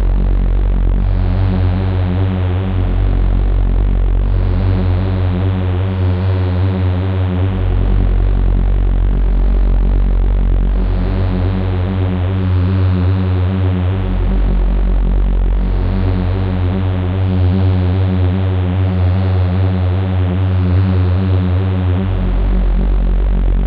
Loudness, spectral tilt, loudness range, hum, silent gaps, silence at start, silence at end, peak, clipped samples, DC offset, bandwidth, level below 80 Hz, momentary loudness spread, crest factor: -16 LUFS; -11 dB/octave; 2 LU; none; none; 0 s; 0 s; -2 dBFS; under 0.1%; under 0.1%; 4.6 kHz; -16 dBFS; 3 LU; 10 dB